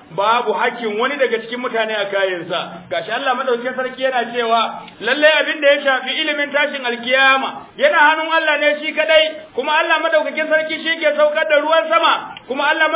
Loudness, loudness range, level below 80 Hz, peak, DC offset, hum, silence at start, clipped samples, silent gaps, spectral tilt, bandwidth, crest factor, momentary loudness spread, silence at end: -16 LUFS; 5 LU; -66 dBFS; -2 dBFS; under 0.1%; none; 0.1 s; under 0.1%; none; -6 dB/octave; 4 kHz; 16 dB; 9 LU; 0 s